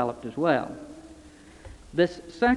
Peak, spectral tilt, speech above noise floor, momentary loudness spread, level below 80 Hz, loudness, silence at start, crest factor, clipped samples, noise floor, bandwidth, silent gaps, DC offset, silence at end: -8 dBFS; -6.5 dB/octave; 24 dB; 23 LU; -52 dBFS; -27 LUFS; 0 s; 20 dB; under 0.1%; -50 dBFS; 11.5 kHz; none; under 0.1%; 0 s